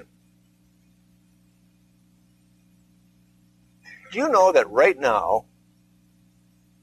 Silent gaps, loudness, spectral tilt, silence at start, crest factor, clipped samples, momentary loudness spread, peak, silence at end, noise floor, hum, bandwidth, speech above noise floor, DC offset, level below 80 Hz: none; -20 LUFS; -4 dB/octave; 4.1 s; 22 dB; under 0.1%; 10 LU; -4 dBFS; 1.4 s; -60 dBFS; 60 Hz at -55 dBFS; 13.5 kHz; 41 dB; under 0.1%; -62 dBFS